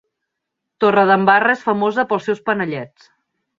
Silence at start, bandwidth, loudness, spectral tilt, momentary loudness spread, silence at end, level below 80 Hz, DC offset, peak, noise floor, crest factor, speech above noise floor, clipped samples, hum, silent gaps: 0.8 s; 7.4 kHz; -16 LUFS; -6.5 dB/octave; 11 LU; 0.7 s; -64 dBFS; under 0.1%; -2 dBFS; -79 dBFS; 16 dB; 63 dB; under 0.1%; none; none